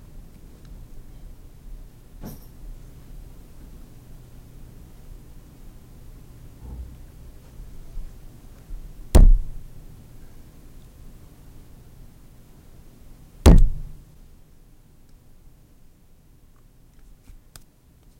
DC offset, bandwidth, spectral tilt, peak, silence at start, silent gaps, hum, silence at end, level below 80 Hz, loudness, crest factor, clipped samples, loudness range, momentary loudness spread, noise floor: under 0.1%; 16 kHz; -6.5 dB/octave; -4 dBFS; 1.7 s; none; none; 4.35 s; -26 dBFS; -20 LUFS; 20 dB; under 0.1%; 22 LU; 30 LU; -53 dBFS